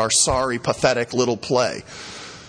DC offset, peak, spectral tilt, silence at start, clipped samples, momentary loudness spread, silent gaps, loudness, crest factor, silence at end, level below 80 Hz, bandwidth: under 0.1%; -2 dBFS; -3 dB/octave; 0 s; under 0.1%; 17 LU; none; -20 LUFS; 18 dB; 0 s; -44 dBFS; 10.5 kHz